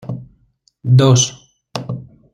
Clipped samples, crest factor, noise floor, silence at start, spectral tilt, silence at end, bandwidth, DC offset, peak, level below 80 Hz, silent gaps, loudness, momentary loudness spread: under 0.1%; 16 dB; -58 dBFS; 0.05 s; -5 dB/octave; 0.35 s; 9.8 kHz; under 0.1%; -2 dBFS; -50 dBFS; none; -14 LUFS; 19 LU